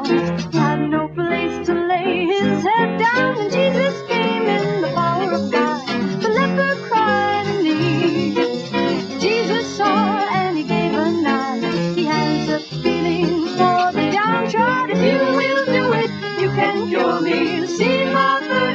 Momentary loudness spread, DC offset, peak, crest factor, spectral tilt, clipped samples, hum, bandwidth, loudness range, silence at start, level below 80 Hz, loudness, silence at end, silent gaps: 4 LU; under 0.1%; -2 dBFS; 16 dB; -6 dB/octave; under 0.1%; none; 7.8 kHz; 2 LU; 0 s; -54 dBFS; -18 LUFS; 0 s; none